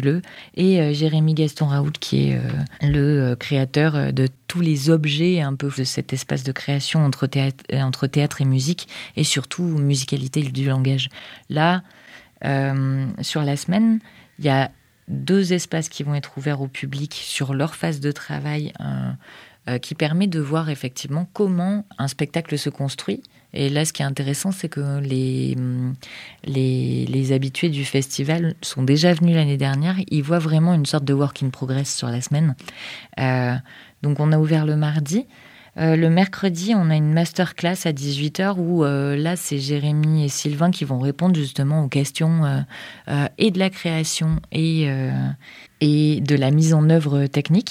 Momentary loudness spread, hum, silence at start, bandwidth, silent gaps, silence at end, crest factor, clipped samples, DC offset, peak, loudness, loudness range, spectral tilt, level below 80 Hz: 9 LU; none; 0 s; 15 kHz; none; 0 s; 16 dB; under 0.1%; under 0.1%; -4 dBFS; -21 LUFS; 5 LU; -6 dB/octave; -52 dBFS